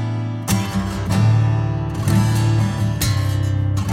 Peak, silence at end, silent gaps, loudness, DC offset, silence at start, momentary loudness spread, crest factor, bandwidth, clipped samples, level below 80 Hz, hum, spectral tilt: -4 dBFS; 0 s; none; -19 LUFS; under 0.1%; 0 s; 6 LU; 14 dB; 16.5 kHz; under 0.1%; -34 dBFS; none; -6 dB/octave